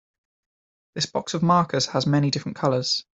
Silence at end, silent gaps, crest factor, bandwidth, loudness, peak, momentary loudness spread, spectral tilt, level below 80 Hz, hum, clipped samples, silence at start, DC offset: 0.2 s; none; 18 dB; 8.2 kHz; -23 LUFS; -6 dBFS; 7 LU; -5 dB/octave; -62 dBFS; none; under 0.1%; 0.95 s; under 0.1%